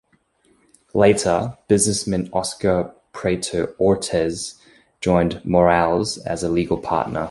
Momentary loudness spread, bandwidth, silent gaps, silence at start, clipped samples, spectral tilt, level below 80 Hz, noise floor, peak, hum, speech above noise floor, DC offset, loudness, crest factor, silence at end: 9 LU; 12 kHz; none; 0.95 s; under 0.1%; -5 dB/octave; -44 dBFS; -61 dBFS; -2 dBFS; none; 41 dB; under 0.1%; -20 LUFS; 20 dB; 0 s